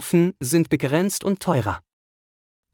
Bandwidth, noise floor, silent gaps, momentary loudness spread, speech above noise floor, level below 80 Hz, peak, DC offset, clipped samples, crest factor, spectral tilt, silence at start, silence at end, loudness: 19 kHz; under -90 dBFS; none; 5 LU; over 69 dB; -56 dBFS; -6 dBFS; under 0.1%; under 0.1%; 16 dB; -5.5 dB/octave; 0 s; 0.95 s; -22 LUFS